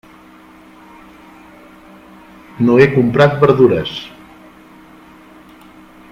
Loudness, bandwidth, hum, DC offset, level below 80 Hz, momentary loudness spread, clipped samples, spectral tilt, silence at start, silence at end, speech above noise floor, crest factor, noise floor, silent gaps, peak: -12 LUFS; 9.6 kHz; none; under 0.1%; -50 dBFS; 16 LU; under 0.1%; -8 dB/octave; 2.55 s; 2.05 s; 31 dB; 18 dB; -42 dBFS; none; 0 dBFS